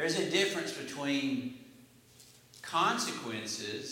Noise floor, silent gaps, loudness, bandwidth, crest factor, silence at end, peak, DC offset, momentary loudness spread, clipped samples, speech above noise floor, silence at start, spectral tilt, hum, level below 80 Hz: -59 dBFS; none; -33 LUFS; 16.5 kHz; 18 dB; 0 s; -16 dBFS; under 0.1%; 10 LU; under 0.1%; 25 dB; 0 s; -3 dB/octave; none; -78 dBFS